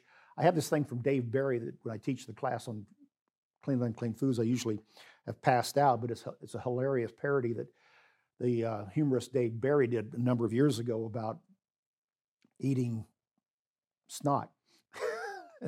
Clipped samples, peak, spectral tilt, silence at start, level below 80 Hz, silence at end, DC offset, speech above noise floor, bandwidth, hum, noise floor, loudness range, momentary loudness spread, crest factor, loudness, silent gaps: under 0.1%; -12 dBFS; -6.5 dB/octave; 0.35 s; -80 dBFS; 0 s; under 0.1%; over 58 dB; 16 kHz; none; under -90 dBFS; 7 LU; 14 LU; 22 dB; -33 LUFS; 3.21-3.26 s, 3.37-3.50 s, 11.78-12.08 s, 12.21-12.37 s, 13.53-13.76 s